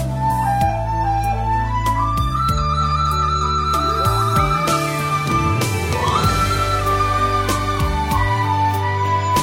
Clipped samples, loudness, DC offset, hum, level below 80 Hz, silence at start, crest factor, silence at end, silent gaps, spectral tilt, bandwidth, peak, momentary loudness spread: under 0.1%; -18 LUFS; under 0.1%; none; -28 dBFS; 0 s; 14 dB; 0 s; none; -5 dB/octave; 16.5 kHz; -4 dBFS; 3 LU